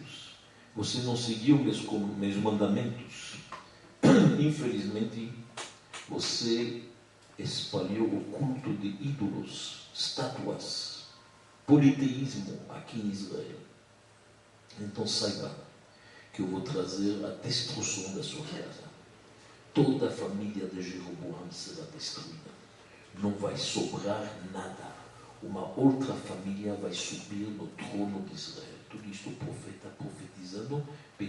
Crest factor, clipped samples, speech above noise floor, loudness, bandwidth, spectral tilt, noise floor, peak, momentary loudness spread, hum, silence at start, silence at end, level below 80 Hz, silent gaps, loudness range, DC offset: 24 dB; under 0.1%; 27 dB; -32 LUFS; 11.5 kHz; -5 dB/octave; -59 dBFS; -10 dBFS; 18 LU; none; 0 s; 0 s; -70 dBFS; none; 9 LU; under 0.1%